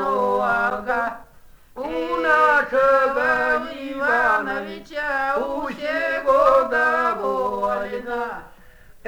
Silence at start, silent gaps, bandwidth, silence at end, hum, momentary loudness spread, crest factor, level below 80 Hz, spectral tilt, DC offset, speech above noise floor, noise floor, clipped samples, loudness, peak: 0 s; none; over 20 kHz; 0 s; none; 12 LU; 16 dB; -50 dBFS; -4.5 dB/octave; under 0.1%; 27 dB; -47 dBFS; under 0.1%; -20 LUFS; -6 dBFS